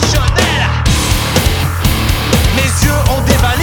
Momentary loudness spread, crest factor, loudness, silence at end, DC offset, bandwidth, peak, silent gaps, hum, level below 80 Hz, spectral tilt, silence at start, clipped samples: 2 LU; 12 dB; -12 LUFS; 0 s; under 0.1%; over 20 kHz; 0 dBFS; none; none; -16 dBFS; -4 dB/octave; 0 s; under 0.1%